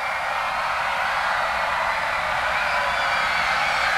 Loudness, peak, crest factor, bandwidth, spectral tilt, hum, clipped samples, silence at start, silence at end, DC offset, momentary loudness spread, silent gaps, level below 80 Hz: -22 LUFS; -8 dBFS; 14 dB; 16 kHz; -1.5 dB/octave; none; under 0.1%; 0 s; 0 s; under 0.1%; 3 LU; none; -48 dBFS